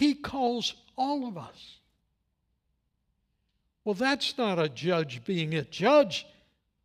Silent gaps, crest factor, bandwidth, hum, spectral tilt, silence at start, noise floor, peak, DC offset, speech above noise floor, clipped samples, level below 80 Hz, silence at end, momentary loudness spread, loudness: none; 20 dB; 14.5 kHz; none; -5 dB/octave; 0 s; -77 dBFS; -10 dBFS; under 0.1%; 49 dB; under 0.1%; -68 dBFS; 0.6 s; 13 LU; -28 LUFS